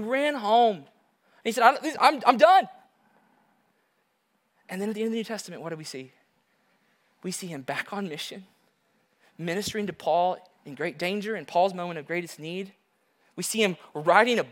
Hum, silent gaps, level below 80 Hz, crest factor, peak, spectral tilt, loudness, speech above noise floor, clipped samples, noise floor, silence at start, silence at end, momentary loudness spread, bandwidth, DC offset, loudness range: none; none; -76 dBFS; 24 dB; -2 dBFS; -4 dB/octave; -26 LUFS; 47 dB; under 0.1%; -73 dBFS; 0 s; 0 s; 18 LU; 17 kHz; under 0.1%; 13 LU